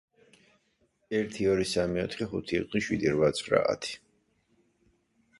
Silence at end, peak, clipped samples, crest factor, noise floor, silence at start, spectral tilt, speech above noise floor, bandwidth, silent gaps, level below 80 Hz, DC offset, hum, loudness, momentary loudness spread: 1.4 s; -8 dBFS; under 0.1%; 22 dB; -72 dBFS; 1.1 s; -5 dB/octave; 43 dB; 11.5 kHz; none; -56 dBFS; under 0.1%; none; -29 LUFS; 8 LU